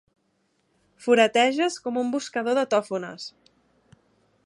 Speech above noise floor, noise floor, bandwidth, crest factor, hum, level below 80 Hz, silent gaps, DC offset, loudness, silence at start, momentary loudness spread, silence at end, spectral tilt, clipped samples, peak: 47 dB; -70 dBFS; 11.5 kHz; 22 dB; none; -76 dBFS; none; under 0.1%; -23 LUFS; 1 s; 16 LU; 1.15 s; -3.5 dB/octave; under 0.1%; -4 dBFS